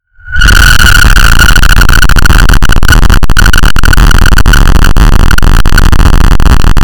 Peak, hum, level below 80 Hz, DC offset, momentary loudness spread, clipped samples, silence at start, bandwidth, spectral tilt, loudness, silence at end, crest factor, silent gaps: 0 dBFS; none; -4 dBFS; under 0.1%; 4 LU; 4%; 0 s; 19.5 kHz; -4 dB/octave; -6 LUFS; 0 s; 2 dB; none